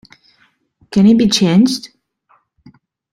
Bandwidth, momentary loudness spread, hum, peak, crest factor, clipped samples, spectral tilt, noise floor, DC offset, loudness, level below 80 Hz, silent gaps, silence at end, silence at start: 13 kHz; 9 LU; none; -2 dBFS; 14 dB; under 0.1%; -5.5 dB/octave; -57 dBFS; under 0.1%; -12 LUFS; -50 dBFS; none; 1.25 s; 0.9 s